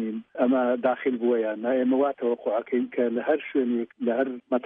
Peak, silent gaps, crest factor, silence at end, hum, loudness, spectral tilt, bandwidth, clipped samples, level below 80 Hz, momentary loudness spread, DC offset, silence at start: -10 dBFS; none; 14 dB; 0.05 s; none; -26 LUFS; -9.5 dB/octave; 3.7 kHz; under 0.1%; -78 dBFS; 5 LU; under 0.1%; 0 s